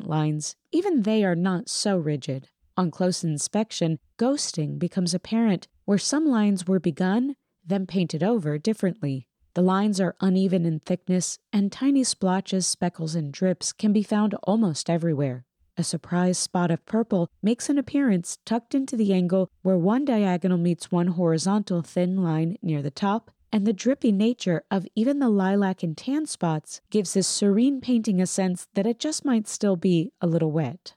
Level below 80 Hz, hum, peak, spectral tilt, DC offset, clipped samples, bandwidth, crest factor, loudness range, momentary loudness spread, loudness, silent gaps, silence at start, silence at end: -72 dBFS; none; -12 dBFS; -5.5 dB/octave; under 0.1%; under 0.1%; 12.5 kHz; 12 dB; 2 LU; 6 LU; -25 LUFS; none; 0 s; 0.05 s